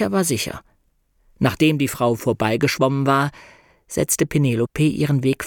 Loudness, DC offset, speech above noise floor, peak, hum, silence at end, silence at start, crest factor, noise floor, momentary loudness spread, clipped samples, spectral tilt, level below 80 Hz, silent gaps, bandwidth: -20 LUFS; under 0.1%; 44 dB; -2 dBFS; none; 0 s; 0 s; 18 dB; -63 dBFS; 7 LU; under 0.1%; -5 dB/octave; -48 dBFS; none; 19 kHz